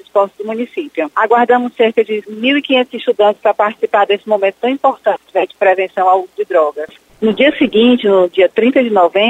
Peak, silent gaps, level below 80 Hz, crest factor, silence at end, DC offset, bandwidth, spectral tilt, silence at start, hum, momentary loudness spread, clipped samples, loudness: 0 dBFS; none; -58 dBFS; 12 dB; 0 s; under 0.1%; 9 kHz; -6 dB/octave; 0.15 s; none; 8 LU; under 0.1%; -13 LUFS